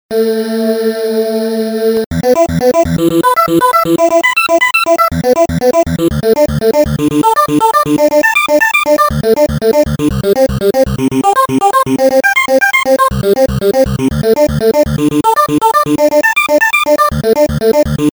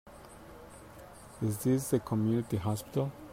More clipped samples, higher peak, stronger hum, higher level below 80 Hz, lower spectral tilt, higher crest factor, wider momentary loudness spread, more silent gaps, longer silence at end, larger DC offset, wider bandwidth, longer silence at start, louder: neither; first, 0 dBFS vs -16 dBFS; neither; first, -30 dBFS vs -60 dBFS; second, -5 dB/octave vs -7 dB/octave; second, 10 dB vs 18 dB; second, 4 LU vs 21 LU; first, 2.06-2.11 s vs none; about the same, 0.05 s vs 0 s; neither; first, over 20 kHz vs 16 kHz; about the same, 0.1 s vs 0.05 s; first, -10 LUFS vs -32 LUFS